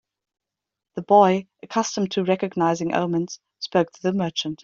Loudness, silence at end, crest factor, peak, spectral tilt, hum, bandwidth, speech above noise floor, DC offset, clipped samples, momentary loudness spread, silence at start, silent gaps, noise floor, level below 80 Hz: -22 LUFS; 0.1 s; 20 dB; -4 dBFS; -5.5 dB/octave; none; 7.6 kHz; 64 dB; under 0.1%; under 0.1%; 13 LU; 0.95 s; none; -86 dBFS; -66 dBFS